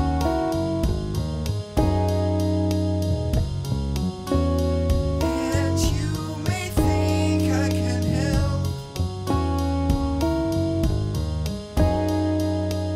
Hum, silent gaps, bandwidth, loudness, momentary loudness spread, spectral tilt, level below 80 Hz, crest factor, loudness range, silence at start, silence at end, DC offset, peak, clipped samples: none; none; 15.5 kHz; -24 LUFS; 5 LU; -6.5 dB/octave; -32 dBFS; 16 dB; 1 LU; 0 s; 0 s; under 0.1%; -8 dBFS; under 0.1%